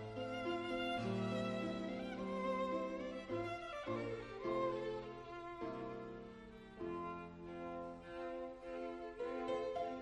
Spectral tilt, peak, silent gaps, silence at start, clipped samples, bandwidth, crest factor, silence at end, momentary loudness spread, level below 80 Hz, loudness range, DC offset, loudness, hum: -6.5 dB/octave; -28 dBFS; none; 0 s; under 0.1%; 11 kHz; 16 dB; 0 s; 10 LU; -66 dBFS; 7 LU; under 0.1%; -44 LUFS; none